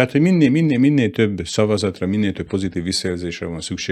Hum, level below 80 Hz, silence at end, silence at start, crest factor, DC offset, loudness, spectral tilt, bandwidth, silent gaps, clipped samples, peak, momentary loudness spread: none; -52 dBFS; 0 s; 0 s; 18 dB; under 0.1%; -19 LUFS; -6 dB/octave; 13 kHz; none; under 0.1%; 0 dBFS; 11 LU